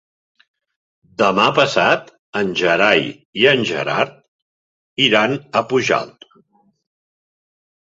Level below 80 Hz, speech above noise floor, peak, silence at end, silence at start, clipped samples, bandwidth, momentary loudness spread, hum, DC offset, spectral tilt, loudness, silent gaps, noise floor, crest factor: -60 dBFS; 41 dB; 0 dBFS; 1.75 s; 1.2 s; under 0.1%; 8 kHz; 11 LU; none; under 0.1%; -4 dB/octave; -16 LUFS; 2.19-2.33 s, 3.25-3.33 s, 4.28-4.96 s; -57 dBFS; 18 dB